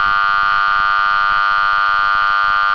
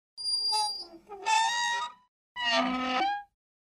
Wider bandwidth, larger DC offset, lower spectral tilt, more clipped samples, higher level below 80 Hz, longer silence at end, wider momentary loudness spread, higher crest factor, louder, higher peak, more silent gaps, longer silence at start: second, 5.4 kHz vs 15.5 kHz; first, 2% vs under 0.1%; first, -2 dB/octave vs -0.5 dB/octave; neither; first, -42 dBFS vs -68 dBFS; second, 0 s vs 0.4 s; second, 0 LU vs 13 LU; second, 10 dB vs 18 dB; first, -14 LUFS vs -28 LUFS; first, -4 dBFS vs -14 dBFS; second, none vs 2.08-2.35 s; second, 0 s vs 0.15 s